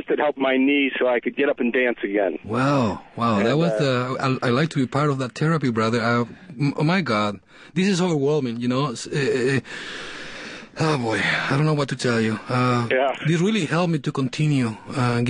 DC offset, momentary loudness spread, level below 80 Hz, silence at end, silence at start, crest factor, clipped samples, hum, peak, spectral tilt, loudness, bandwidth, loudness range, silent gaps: under 0.1%; 6 LU; -58 dBFS; 0 s; 0 s; 14 dB; under 0.1%; none; -6 dBFS; -6 dB/octave; -22 LUFS; 10.5 kHz; 2 LU; none